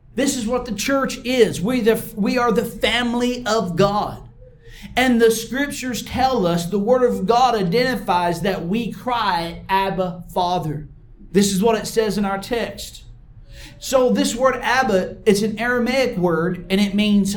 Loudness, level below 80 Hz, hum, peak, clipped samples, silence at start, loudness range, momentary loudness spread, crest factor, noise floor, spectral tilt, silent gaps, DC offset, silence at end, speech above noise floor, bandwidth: -19 LUFS; -42 dBFS; none; -2 dBFS; under 0.1%; 0.15 s; 3 LU; 7 LU; 18 dB; -42 dBFS; -4.5 dB/octave; none; under 0.1%; 0 s; 23 dB; 19 kHz